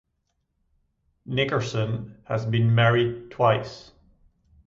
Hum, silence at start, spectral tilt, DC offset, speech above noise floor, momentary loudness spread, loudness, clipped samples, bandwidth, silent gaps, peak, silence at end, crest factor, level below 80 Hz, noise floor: none; 1.3 s; -7 dB/octave; under 0.1%; 52 dB; 12 LU; -24 LUFS; under 0.1%; 7.6 kHz; none; -8 dBFS; 0.85 s; 18 dB; -56 dBFS; -75 dBFS